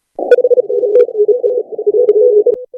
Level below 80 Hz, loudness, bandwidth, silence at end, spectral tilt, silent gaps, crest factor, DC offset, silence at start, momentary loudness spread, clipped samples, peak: -68 dBFS; -11 LUFS; 4.5 kHz; 0 s; -6 dB/octave; none; 12 dB; under 0.1%; 0.2 s; 6 LU; 0.4%; 0 dBFS